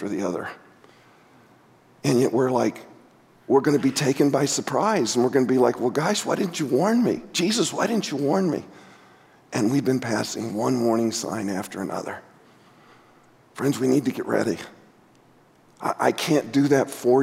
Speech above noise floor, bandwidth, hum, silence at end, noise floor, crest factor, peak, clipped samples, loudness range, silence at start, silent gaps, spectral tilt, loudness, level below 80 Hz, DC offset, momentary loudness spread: 34 dB; 16 kHz; none; 0 s; -56 dBFS; 18 dB; -6 dBFS; under 0.1%; 6 LU; 0 s; none; -5 dB/octave; -23 LUFS; -70 dBFS; under 0.1%; 10 LU